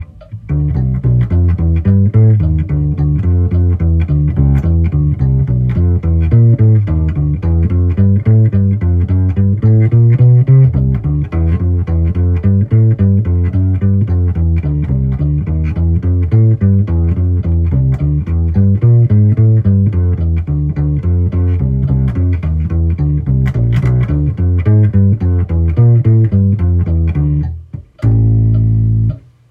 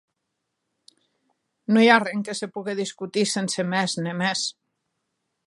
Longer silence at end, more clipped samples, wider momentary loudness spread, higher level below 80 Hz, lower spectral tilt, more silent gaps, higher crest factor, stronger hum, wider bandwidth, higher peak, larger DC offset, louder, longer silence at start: second, 0.3 s vs 0.95 s; neither; second, 6 LU vs 13 LU; first, -24 dBFS vs -78 dBFS; first, -12 dB/octave vs -4 dB/octave; neither; second, 10 dB vs 24 dB; neither; second, 3.3 kHz vs 11.5 kHz; about the same, 0 dBFS vs -2 dBFS; neither; first, -12 LUFS vs -23 LUFS; second, 0 s vs 1.7 s